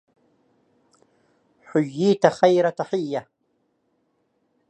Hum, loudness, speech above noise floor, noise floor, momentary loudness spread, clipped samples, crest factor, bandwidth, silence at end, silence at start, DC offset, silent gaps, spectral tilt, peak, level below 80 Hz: none; -21 LUFS; 50 dB; -70 dBFS; 10 LU; under 0.1%; 24 dB; 9 kHz; 1.5 s; 1.75 s; under 0.1%; none; -6.5 dB/octave; -2 dBFS; -74 dBFS